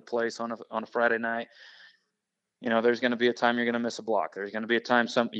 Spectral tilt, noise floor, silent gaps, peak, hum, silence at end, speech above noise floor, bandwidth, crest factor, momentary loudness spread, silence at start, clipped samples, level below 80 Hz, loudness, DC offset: -4.5 dB/octave; -85 dBFS; none; -8 dBFS; none; 0 s; 57 dB; 8.4 kHz; 20 dB; 10 LU; 0.05 s; under 0.1%; -86 dBFS; -28 LUFS; under 0.1%